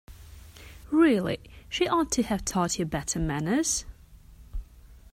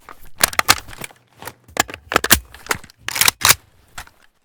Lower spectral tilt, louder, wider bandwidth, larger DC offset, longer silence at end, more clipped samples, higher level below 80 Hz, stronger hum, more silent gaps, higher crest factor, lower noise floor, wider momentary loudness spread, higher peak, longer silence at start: first, -4 dB/octave vs -0.5 dB/octave; second, -27 LUFS vs -17 LUFS; second, 16 kHz vs over 20 kHz; neither; second, 0.15 s vs 0.4 s; second, under 0.1% vs 0.1%; about the same, -44 dBFS vs -40 dBFS; neither; neither; about the same, 18 dB vs 20 dB; first, -51 dBFS vs -39 dBFS; about the same, 21 LU vs 23 LU; second, -10 dBFS vs 0 dBFS; second, 0.1 s vs 0.25 s